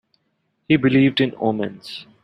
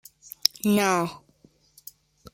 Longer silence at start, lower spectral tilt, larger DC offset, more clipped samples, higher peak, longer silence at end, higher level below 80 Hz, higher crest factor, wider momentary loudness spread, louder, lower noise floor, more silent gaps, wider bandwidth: about the same, 0.7 s vs 0.65 s; first, -7.5 dB/octave vs -3.5 dB/octave; neither; neither; about the same, -2 dBFS vs -2 dBFS; second, 0.2 s vs 1.2 s; about the same, -60 dBFS vs -64 dBFS; second, 18 dB vs 26 dB; second, 16 LU vs 24 LU; first, -19 LUFS vs -24 LUFS; first, -70 dBFS vs -60 dBFS; neither; second, 9.8 kHz vs 16.5 kHz